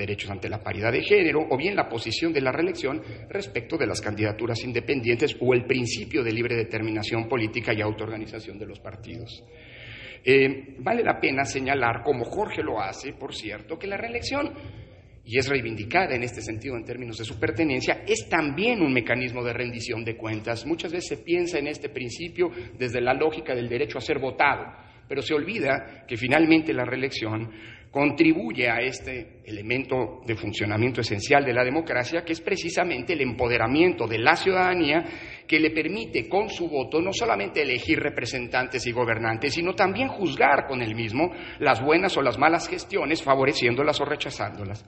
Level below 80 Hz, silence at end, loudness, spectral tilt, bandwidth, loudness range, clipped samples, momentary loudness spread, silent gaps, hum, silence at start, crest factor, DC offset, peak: -54 dBFS; 0.05 s; -25 LUFS; -5 dB/octave; 10.5 kHz; 5 LU; under 0.1%; 13 LU; none; none; 0 s; 24 dB; under 0.1%; -2 dBFS